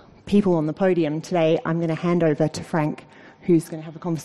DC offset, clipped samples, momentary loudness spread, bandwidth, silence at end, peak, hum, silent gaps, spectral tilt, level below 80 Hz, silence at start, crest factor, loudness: 0.2%; under 0.1%; 10 LU; 12.5 kHz; 0 s; -8 dBFS; none; none; -7.5 dB/octave; -56 dBFS; 0.25 s; 14 dB; -22 LUFS